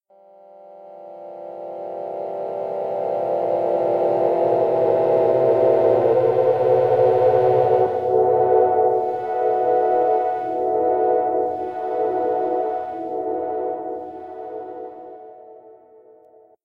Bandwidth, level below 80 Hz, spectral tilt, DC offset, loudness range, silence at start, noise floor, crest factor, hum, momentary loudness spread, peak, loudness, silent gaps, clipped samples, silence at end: 5.2 kHz; -66 dBFS; -9 dB/octave; under 0.1%; 12 LU; 0.6 s; -51 dBFS; 16 dB; none; 17 LU; -4 dBFS; -20 LUFS; none; under 0.1%; 0.9 s